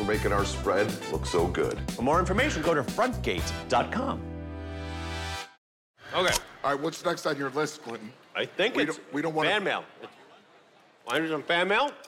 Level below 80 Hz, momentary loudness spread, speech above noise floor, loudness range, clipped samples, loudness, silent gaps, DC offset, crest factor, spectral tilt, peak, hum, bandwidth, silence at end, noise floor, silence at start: -44 dBFS; 13 LU; 30 dB; 4 LU; under 0.1%; -28 LUFS; 5.58-5.94 s; under 0.1%; 16 dB; -4.5 dB/octave; -12 dBFS; none; 17 kHz; 0 s; -58 dBFS; 0 s